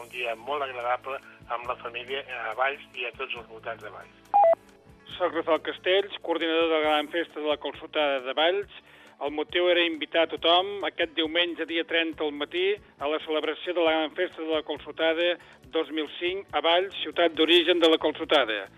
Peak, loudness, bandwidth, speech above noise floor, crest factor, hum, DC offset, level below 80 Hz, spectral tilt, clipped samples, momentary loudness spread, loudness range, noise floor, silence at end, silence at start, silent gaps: -8 dBFS; -26 LUFS; 14 kHz; 27 dB; 18 dB; none; under 0.1%; -64 dBFS; -4 dB/octave; under 0.1%; 12 LU; 4 LU; -54 dBFS; 0.1 s; 0 s; none